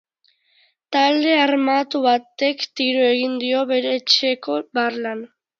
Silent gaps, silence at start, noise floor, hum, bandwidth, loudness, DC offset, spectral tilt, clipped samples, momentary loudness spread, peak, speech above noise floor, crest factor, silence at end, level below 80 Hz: none; 0.9 s; -63 dBFS; none; 7.6 kHz; -19 LUFS; under 0.1%; -2.5 dB/octave; under 0.1%; 8 LU; 0 dBFS; 44 dB; 20 dB; 0.35 s; -76 dBFS